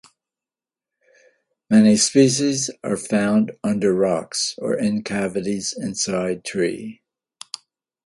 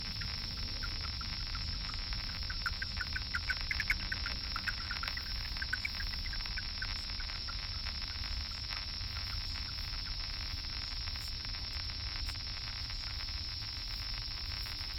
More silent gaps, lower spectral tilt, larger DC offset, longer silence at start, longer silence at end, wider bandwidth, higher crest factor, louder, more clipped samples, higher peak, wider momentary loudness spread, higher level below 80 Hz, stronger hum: neither; first, -4.5 dB/octave vs -3 dB/octave; neither; first, 1.7 s vs 0 s; first, 1.1 s vs 0 s; second, 11.5 kHz vs 17.5 kHz; about the same, 20 dB vs 20 dB; first, -20 LUFS vs -38 LUFS; neither; first, -2 dBFS vs -18 dBFS; first, 13 LU vs 3 LU; second, -60 dBFS vs -44 dBFS; neither